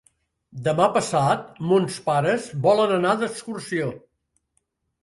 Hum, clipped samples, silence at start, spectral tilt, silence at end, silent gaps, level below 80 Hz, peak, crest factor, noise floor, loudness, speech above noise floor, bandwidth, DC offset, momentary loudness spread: none; under 0.1%; 0.55 s; -5.5 dB/octave; 1.05 s; none; -62 dBFS; -4 dBFS; 20 dB; -73 dBFS; -22 LUFS; 51 dB; 11.5 kHz; under 0.1%; 9 LU